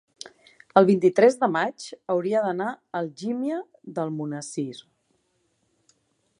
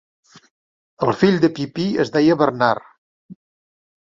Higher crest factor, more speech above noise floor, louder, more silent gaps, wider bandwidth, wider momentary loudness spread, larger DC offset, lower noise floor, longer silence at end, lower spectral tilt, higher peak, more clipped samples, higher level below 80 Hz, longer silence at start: first, 24 dB vs 18 dB; second, 47 dB vs over 73 dB; second, -24 LUFS vs -18 LUFS; second, none vs 2.98-3.29 s; first, 11.5 kHz vs 7.6 kHz; first, 18 LU vs 8 LU; neither; second, -71 dBFS vs under -90 dBFS; first, 1.6 s vs 0.85 s; about the same, -6 dB/octave vs -7 dB/octave; about the same, -2 dBFS vs -2 dBFS; neither; second, -76 dBFS vs -60 dBFS; second, 0.75 s vs 1 s